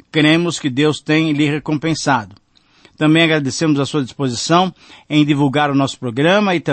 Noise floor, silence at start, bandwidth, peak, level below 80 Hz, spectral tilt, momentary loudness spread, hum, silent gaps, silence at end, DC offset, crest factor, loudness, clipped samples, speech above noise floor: -51 dBFS; 0.15 s; 8.8 kHz; -2 dBFS; -56 dBFS; -5 dB/octave; 7 LU; none; none; 0 s; under 0.1%; 14 dB; -16 LUFS; under 0.1%; 36 dB